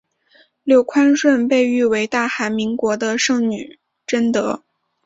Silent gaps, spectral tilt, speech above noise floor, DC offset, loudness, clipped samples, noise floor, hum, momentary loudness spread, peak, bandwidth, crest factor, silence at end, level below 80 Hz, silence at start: none; -4 dB/octave; 39 dB; under 0.1%; -17 LUFS; under 0.1%; -55 dBFS; none; 14 LU; -2 dBFS; 8 kHz; 16 dB; 0.5 s; -62 dBFS; 0.65 s